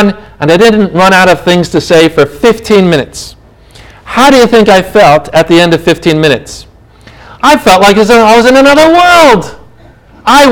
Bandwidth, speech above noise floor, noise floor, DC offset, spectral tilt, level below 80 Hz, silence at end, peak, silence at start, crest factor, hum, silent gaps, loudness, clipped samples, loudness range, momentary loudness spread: over 20 kHz; 32 dB; -37 dBFS; under 0.1%; -4.5 dB/octave; -34 dBFS; 0 s; 0 dBFS; 0 s; 6 dB; none; none; -5 LUFS; 20%; 3 LU; 10 LU